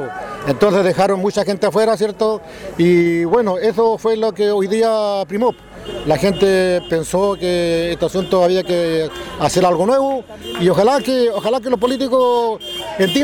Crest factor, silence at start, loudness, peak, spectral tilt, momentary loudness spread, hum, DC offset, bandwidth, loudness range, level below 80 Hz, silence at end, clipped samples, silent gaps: 12 dB; 0 s; -16 LUFS; -4 dBFS; -5.5 dB/octave; 7 LU; none; under 0.1%; 18 kHz; 1 LU; -44 dBFS; 0 s; under 0.1%; none